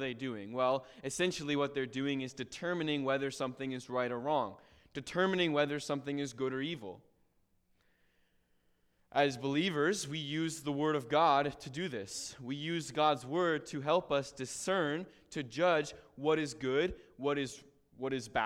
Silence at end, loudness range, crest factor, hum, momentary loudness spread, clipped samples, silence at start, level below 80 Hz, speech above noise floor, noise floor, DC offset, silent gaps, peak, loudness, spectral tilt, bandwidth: 0 s; 4 LU; 20 dB; none; 10 LU; under 0.1%; 0 s; -66 dBFS; 39 dB; -73 dBFS; under 0.1%; none; -14 dBFS; -35 LUFS; -4.5 dB/octave; 15.5 kHz